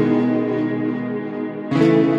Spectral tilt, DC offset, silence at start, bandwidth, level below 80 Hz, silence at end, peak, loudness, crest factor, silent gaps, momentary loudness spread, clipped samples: -8.5 dB/octave; under 0.1%; 0 s; 7.6 kHz; -62 dBFS; 0 s; -4 dBFS; -20 LUFS; 14 dB; none; 10 LU; under 0.1%